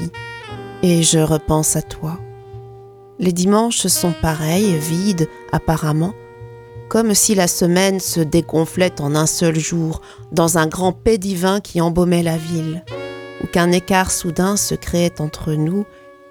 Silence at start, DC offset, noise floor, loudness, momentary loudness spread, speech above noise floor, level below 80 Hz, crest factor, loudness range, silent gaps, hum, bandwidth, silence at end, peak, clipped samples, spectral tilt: 0 s; under 0.1%; -40 dBFS; -17 LUFS; 16 LU; 23 dB; -38 dBFS; 18 dB; 2 LU; none; none; 19 kHz; 0.2 s; 0 dBFS; under 0.1%; -4.5 dB/octave